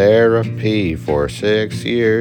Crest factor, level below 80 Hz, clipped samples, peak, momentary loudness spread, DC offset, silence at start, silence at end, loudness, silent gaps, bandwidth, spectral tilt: 14 dB; -40 dBFS; under 0.1%; -2 dBFS; 6 LU; under 0.1%; 0 s; 0 s; -16 LUFS; none; 12.5 kHz; -6.5 dB/octave